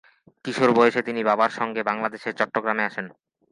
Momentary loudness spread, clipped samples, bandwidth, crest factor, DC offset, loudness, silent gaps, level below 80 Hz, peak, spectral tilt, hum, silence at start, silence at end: 13 LU; under 0.1%; 11 kHz; 20 dB; under 0.1%; -23 LUFS; none; -72 dBFS; -2 dBFS; -5.5 dB/octave; none; 0.45 s; 0.4 s